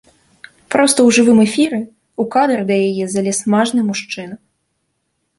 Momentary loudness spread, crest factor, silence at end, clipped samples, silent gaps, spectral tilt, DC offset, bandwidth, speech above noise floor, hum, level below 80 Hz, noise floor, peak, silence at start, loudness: 15 LU; 14 dB; 1 s; under 0.1%; none; -4 dB/octave; under 0.1%; 11.5 kHz; 55 dB; none; -60 dBFS; -69 dBFS; -2 dBFS; 0.7 s; -14 LUFS